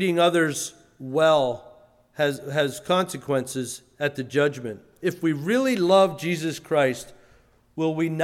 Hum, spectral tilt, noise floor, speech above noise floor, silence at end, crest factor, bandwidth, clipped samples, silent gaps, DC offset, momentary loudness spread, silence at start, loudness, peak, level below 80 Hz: none; -5 dB/octave; -58 dBFS; 35 dB; 0 s; 18 dB; 16 kHz; under 0.1%; none; under 0.1%; 16 LU; 0 s; -24 LUFS; -6 dBFS; -64 dBFS